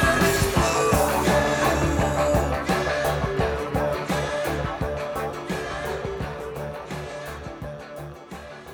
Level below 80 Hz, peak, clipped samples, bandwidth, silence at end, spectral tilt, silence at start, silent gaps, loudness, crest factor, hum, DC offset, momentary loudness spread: -36 dBFS; -8 dBFS; under 0.1%; over 20 kHz; 0 s; -5 dB/octave; 0 s; none; -24 LUFS; 16 dB; none; under 0.1%; 15 LU